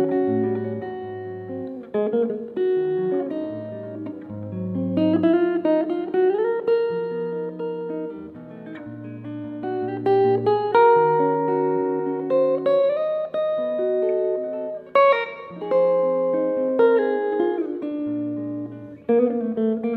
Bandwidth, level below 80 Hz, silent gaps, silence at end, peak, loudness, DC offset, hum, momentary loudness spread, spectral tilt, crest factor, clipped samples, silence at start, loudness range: 4.7 kHz; -68 dBFS; none; 0 s; -6 dBFS; -22 LUFS; under 0.1%; none; 15 LU; -9.5 dB/octave; 16 dB; under 0.1%; 0 s; 6 LU